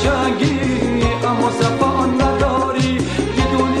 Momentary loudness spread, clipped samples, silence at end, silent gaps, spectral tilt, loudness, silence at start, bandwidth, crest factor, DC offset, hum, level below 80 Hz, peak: 2 LU; under 0.1%; 0 s; none; -6 dB/octave; -17 LUFS; 0 s; 12 kHz; 14 dB; 0.3%; none; -30 dBFS; -2 dBFS